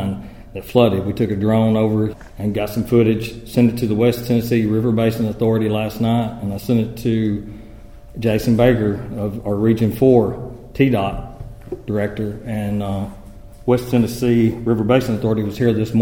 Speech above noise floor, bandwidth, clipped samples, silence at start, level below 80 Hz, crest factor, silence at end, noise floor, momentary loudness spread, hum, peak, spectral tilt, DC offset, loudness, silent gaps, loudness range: 21 dB; 17 kHz; under 0.1%; 0 s; -40 dBFS; 18 dB; 0 s; -38 dBFS; 11 LU; none; 0 dBFS; -7.5 dB/octave; 0.4%; -18 LUFS; none; 3 LU